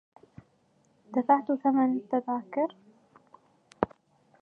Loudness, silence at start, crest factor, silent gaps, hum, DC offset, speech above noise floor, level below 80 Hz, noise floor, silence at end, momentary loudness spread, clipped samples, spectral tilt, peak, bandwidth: -28 LUFS; 1.1 s; 24 dB; none; none; under 0.1%; 40 dB; -66 dBFS; -67 dBFS; 0.55 s; 9 LU; under 0.1%; -8.5 dB/octave; -6 dBFS; 4.4 kHz